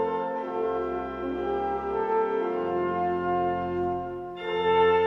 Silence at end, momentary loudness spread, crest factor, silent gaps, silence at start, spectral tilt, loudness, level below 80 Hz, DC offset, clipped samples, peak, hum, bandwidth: 0 s; 7 LU; 14 dB; none; 0 s; -7.5 dB/octave; -28 LUFS; -54 dBFS; under 0.1%; under 0.1%; -12 dBFS; none; 6 kHz